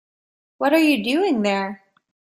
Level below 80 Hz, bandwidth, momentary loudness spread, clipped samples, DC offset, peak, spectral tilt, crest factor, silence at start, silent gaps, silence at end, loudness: -66 dBFS; 15.5 kHz; 8 LU; under 0.1%; under 0.1%; -4 dBFS; -5 dB/octave; 16 dB; 0.6 s; none; 0.55 s; -19 LUFS